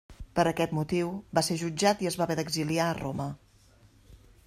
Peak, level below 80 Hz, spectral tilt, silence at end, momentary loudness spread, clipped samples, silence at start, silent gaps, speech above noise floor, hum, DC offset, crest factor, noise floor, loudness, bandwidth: -10 dBFS; -54 dBFS; -5 dB/octave; 0.3 s; 8 LU; under 0.1%; 0.1 s; none; 31 dB; none; under 0.1%; 20 dB; -59 dBFS; -29 LUFS; 15 kHz